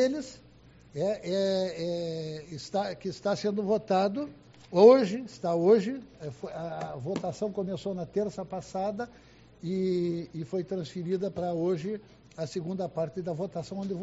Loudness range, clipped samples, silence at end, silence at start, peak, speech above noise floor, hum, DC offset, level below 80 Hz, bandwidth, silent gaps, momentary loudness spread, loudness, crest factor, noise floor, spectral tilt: 9 LU; under 0.1%; 0 s; 0 s; -6 dBFS; 26 dB; none; under 0.1%; -64 dBFS; 8 kHz; none; 15 LU; -30 LUFS; 22 dB; -55 dBFS; -6 dB/octave